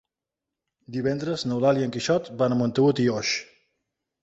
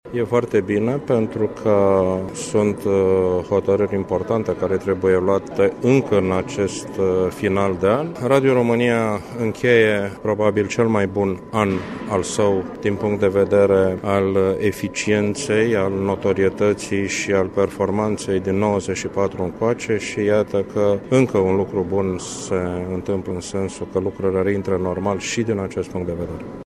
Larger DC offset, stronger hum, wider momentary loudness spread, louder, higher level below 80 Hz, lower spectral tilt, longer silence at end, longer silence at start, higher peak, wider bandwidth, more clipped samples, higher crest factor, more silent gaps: neither; neither; about the same, 7 LU vs 8 LU; second, -24 LUFS vs -20 LUFS; second, -62 dBFS vs -50 dBFS; about the same, -5.5 dB/octave vs -6 dB/octave; first, 0.8 s vs 0.05 s; first, 0.9 s vs 0.05 s; second, -8 dBFS vs -2 dBFS; second, 8 kHz vs 13.5 kHz; neither; about the same, 18 dB vs 18 dB; neither